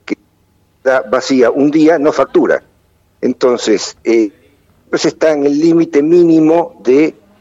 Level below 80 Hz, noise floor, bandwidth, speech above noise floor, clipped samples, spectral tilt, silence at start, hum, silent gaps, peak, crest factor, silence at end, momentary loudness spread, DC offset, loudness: -56 dBFS; -54 dBFS; 7.8 kHz; 44 dB; under 0.1%; -5.5 dB/octave; 0.1 s; none; none; -2 dBFS; 10 dB; 0.3 s; 10 LU; under 0.1%; -12 LUFS